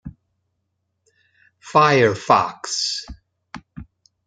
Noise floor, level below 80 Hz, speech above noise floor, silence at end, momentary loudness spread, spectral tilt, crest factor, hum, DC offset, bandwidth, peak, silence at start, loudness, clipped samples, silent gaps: -74 dBFS; -50 dBFS; 56 dB; 0.45 s; 26 LU; -4 dB/octave; 20 dB; none; under 0.1%; 9.6 kHz; -2 dBFS; 0.05 s; -18 LUFS; under 0.1%; none